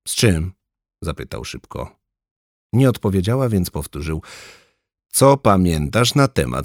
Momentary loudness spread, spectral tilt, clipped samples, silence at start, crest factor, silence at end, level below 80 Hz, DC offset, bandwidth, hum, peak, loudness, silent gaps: 16 LU; -5.5 dB/octave; under 0.1%; 0.05 s; 18 dB; 0 s; -38 dBFS; under 0.1%; 18 kHz; none; -2 dBFS; -18 LUFS; 2.31-2.70 s